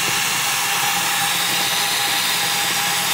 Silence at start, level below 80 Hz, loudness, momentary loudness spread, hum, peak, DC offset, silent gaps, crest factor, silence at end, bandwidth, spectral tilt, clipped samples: 0 s; -58 dBFS; -17 LUFS; 1 LU; none; -6 dBFS; under 0.1%; none; 14 dB; 0 s; 16 kHz; 0 dB/octave; under 0.1%